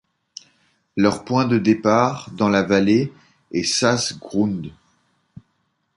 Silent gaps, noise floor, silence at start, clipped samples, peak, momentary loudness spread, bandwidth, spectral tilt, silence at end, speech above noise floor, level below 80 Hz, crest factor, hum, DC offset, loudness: none; -69 dBFS; 0.95 s; under 0.1%; -2 dBFS; 19 LU; 11.5 kHz; -5 dB/octave; 1.25 s; 51 dB; -54 dBFS; 20 dB; none; under 0.1%; -19 LUFS